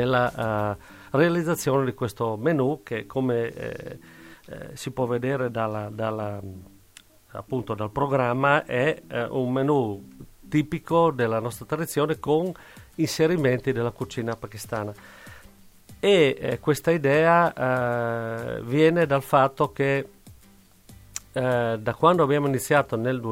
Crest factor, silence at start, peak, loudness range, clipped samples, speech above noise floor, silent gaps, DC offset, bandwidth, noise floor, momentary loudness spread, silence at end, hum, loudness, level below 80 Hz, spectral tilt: 20 dB; 0 s; -6 dBFS; 7 LU; under 0.1%; 30 dB; none; under 0.1%; 16 kHz; -54 dBFS; 15 LU; 0 s; none; -24 LUFS; -56 dBFS; -6 dB/octave